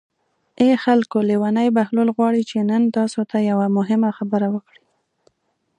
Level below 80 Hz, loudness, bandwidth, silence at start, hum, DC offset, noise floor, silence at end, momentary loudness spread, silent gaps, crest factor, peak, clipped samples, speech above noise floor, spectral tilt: -68 dBFS; -19 LUFS; 10 kHz; 0.6 s; none; under 0.1%; -70 dBFS; 1.2 s; 4 LU; none; 16 dB; -4 dBFS; under 0.1%; 52 dB; -7 dB/octave